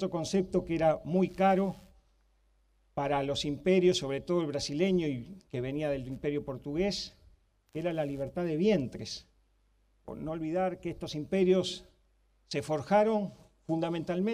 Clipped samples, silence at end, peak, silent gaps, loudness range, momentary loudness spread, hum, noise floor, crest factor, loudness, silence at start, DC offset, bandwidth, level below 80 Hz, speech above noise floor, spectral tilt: under 0.1%; 0 s; -14 dBFS; none; 4 LU; 14 LU; none; -69 dBFS; 16 dB; -31 LUFS; 0 s; under 0.1%; 12 kHz; -58 dBFS; 39 dB; -6 dB/octave